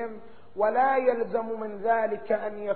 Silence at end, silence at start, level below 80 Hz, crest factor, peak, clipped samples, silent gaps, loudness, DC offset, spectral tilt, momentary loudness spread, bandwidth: 0 s; 0 s; -66 dBFS; 16 dB; -12 dBFS; under 0.1%; none; -27 LUFS; 0.7%; -4 dB/octave; 14 LU; 4.5 kHz